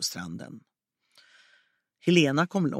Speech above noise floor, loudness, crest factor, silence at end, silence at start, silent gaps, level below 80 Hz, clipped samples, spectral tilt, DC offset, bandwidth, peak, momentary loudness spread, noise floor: 41 dB; -25 LUFS; 22 dB; 0 s; 0 s; none; -72 dBFS; under 0.1%; -5 dB/octave; under 0.1%; 15.5 kHz; -8 dBFS; 20 LU; -67 dBFS